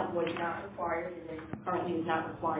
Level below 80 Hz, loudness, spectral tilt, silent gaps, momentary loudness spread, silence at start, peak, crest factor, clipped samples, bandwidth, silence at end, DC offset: -62 dBFS; -35 LUFS; -4.5 dB/octave; none; 8 LU; 0 s; -16 dBFS; 18 dB; under 0.1%; 4 kHz; 0 s; under 0.1%